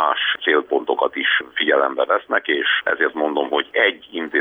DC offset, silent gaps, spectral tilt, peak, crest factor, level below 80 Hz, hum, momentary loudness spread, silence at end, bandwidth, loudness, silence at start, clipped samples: under 0.1%; none; -5 dB/octave; -4 dBFS; 16 dB; -68 dBFS; none; 4 LU; 0 s; 4 kHz; -19 LUFS; 0 s; under 0.1%